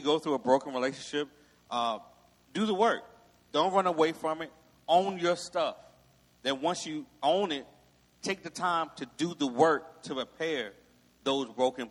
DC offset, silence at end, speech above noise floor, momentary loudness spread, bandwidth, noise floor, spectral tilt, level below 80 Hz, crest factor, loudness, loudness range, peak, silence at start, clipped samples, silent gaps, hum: under 0.1%; 0 s; 33 dB; 12 LU; 13 kHz; -63 dBFS; -4 dB/octave; -72 dBFS; 22 dB; -31 LUFS; 3 LU; -10 dBFS; 0 s; under 0.1%; none; none